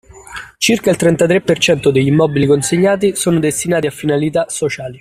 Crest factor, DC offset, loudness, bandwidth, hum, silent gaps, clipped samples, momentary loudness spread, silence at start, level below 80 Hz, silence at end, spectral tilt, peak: 12 dB; under 0.1%; -14 LUFS; 15.5 kHz; none; none; under 0.1%; 7 LU; 0.15 s; -46 dBFS; 0.05 s; -5 dB/octave; 0 dBFS